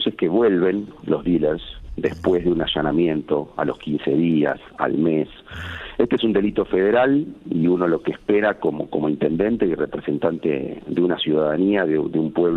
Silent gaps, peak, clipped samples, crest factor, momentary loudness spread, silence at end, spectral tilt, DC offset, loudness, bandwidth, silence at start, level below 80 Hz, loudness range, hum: none; -4 dBFS; under 0.1%; 18 dB; 8 LU; 0 s; -8.5 dB/octave; under 0.1%; -21 LUFS; 6.6 kHz; 0 s; -46 dBFS; 2 LU; none